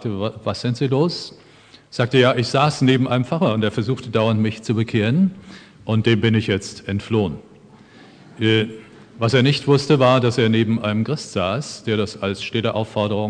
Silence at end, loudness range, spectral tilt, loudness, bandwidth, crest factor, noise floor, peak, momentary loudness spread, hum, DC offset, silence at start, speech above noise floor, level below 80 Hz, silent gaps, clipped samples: 0 s; 4 LU; -6.5 dB/octave; -19 LUFS; 10 kHz; 18 dB; -46 dBFS; -2 dBFS; 9 LU; none; under 0.1%; 0 s; 27 dB; -56 dBFS; none; under 0.1%